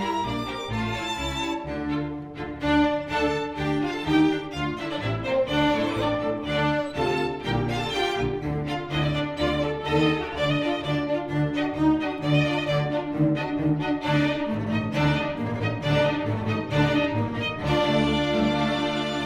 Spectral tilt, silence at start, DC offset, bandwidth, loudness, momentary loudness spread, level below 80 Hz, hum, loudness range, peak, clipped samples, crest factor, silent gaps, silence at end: -6.5 dB/octave; 0 s; under 0.1%; 11.5 kHz; -25 LUFS; 6 LU; -44 dBFS; none; 2 LU; -8 dBFS; under 0.1%; 16 dB; none; 0 s